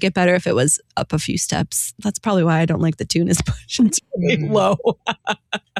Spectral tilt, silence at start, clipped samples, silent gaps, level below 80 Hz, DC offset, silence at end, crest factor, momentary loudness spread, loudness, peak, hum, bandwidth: -4.5 dB/octave; 0 s; under 0.1%; none; -44 dBFS; under 0.1%; 0 s; 14 dB; 7 LU; -19 LUFS; -4 dBFS; none; 14.5 kHz